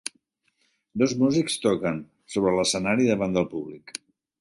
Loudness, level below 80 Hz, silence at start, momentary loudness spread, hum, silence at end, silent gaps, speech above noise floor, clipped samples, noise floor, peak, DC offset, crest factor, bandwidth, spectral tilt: -24 LUFS; -58 dBFS; 0.95 s; 15 LU; none; 0.5 s; none; 47 dB; under 0.1%; -71 dBFS; -8 dBFS; under 0.1%; 18 dB; 11.5 kHz; -4.5 dB/octave